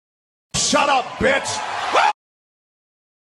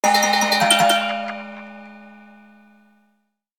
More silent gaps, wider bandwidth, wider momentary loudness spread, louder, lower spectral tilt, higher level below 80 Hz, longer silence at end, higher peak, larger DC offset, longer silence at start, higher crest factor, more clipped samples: neither; second, 12 kHz vs 19 kHz; second, 8 LU vs 23 LU; about the same, -19 LUFS vs -17 LUFS; about the same, -2 dB/octave vs -1.5 dB/octave; first, -48 dBFS vs -74 dBFS; second, 1.15 s vs 1.55 s; about the same, -4 dBFS vs -2 dBFS; neither; first, 0.55 s vs 0.05 s; about the same, 18 dB vs 20 dB; neither